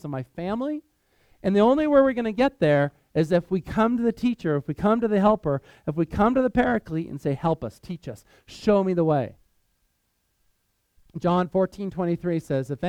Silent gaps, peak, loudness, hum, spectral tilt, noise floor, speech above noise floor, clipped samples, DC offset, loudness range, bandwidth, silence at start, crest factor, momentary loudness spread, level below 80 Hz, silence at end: none; -6 dBFS; -24 LUFS; none; -8 dB/octave; -72 dBFS; 49 dB; under 0.1%; under 0.1%; 6 LU; 13 kHz; 0.05 s; 18 dB; 12 LU; -50 dBFS; 0 s